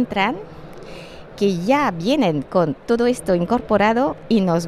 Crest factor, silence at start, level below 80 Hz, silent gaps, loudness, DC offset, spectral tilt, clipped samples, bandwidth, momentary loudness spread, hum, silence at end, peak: 16 dB; 0 s; -46 dBFS; none; -19 LUFS; under 0.1%; -6 dB/octave; under 0.1%; 13.5 kHz; 20 LU; none; 0 s; -2 dBFS